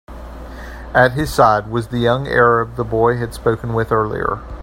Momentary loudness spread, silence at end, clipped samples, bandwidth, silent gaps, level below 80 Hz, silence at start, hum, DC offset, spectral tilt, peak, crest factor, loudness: 20 LU; 0 s; under 0.1%; 16 kHz; none; -34 dBFS; 0.1 s; none; under 0.1%; -6.5 dB/octave; 0 dBFS; 16 dB; -16 LUFS